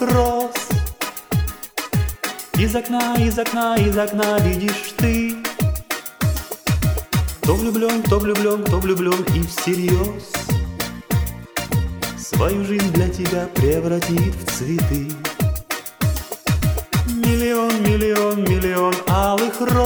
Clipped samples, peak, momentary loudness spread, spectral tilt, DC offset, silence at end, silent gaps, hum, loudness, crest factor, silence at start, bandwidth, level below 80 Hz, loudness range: under 0.1%; -4 dBFS; 7 LU; -5.5 dB/octave; under 0.1%; 0 s; none; none; -20 LUFS; 16 dB; 0 s; over 20 kHz; -30 dBFS; 3 LU